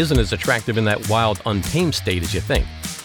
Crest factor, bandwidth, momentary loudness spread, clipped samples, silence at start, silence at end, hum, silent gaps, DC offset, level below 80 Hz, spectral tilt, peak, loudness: 16 dB; over 20 kHz; 4 LU; under 0.1%; 0 s; 0 s; none; none; under 0.1%; -30 dBFS; -5 dB/octave; -4 dBFS; -20 LUFS